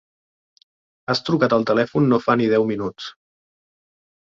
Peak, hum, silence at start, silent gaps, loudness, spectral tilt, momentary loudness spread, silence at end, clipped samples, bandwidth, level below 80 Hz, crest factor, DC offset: -2 dBFS; none; 1.1 s; none; -19 LUFS; -7 dB/octave; 16 LU; 1.2 s; under 0.1%; 7.6 kHz; -58 dBFS; 20 dB; under 0.1%